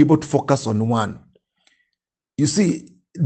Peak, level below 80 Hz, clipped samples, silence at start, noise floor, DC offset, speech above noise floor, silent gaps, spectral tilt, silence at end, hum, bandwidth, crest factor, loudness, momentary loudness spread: -2 dBFS; -58 dBFS; under 0.1%; 0 s; -81 dBFS; under 0.1%; 63 dB; none; -6 dB/octave; 0 s; none; 9 kHz; 18 dB; -20 LUFS; 16 LU